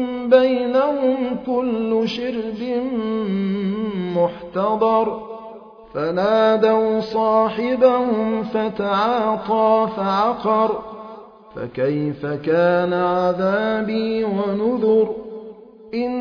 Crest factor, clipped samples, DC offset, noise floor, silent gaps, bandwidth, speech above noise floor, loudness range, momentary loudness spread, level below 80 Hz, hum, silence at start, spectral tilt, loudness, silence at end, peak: 18 dB; under 0.1%; under 0.1%; -40 dBFS; none; 5.4 kHz; 21 dB; 4 LU; 13 LU; -56 dBFS; none; 0 s; -8 dB/octave; -19 LUFS; 0 s; -2 dBFS